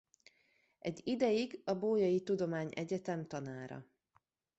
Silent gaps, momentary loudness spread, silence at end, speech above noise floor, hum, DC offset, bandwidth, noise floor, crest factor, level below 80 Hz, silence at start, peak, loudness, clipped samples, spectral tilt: none; 13 LU; 0.75 s; 41 dB; none; under 0.1%; 8.2 kHz; -77 dBFS; 18 dB; -76 dBFS; 0.85 s; -20 dBFS; -37 LUFS; under 0.1%; -6.5 dB/octave